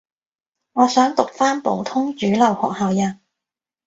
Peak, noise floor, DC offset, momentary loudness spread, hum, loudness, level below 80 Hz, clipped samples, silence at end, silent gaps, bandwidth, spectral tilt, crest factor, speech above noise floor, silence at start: 0 dBFS; -89 dBFS; under 0.1%; 7 LU; none; -19 LUFS; -62 dBFS; under 0.1%; 0.75 s; none; 8 kHz; -5 dB/octave; 20 dB; 71 dB; 0.75 s